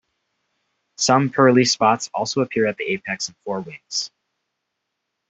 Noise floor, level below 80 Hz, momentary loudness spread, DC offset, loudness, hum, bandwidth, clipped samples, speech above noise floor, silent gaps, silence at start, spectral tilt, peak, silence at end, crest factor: -78 dBFS; -64 dBFS; 13 LU; under 0.1%; -20 LUFS; none; 8.4 kHz; under 0.1%; 59 dB; none; 1 s; -4 dB/octave; -2 dBFS; 1.2 s; 20 dB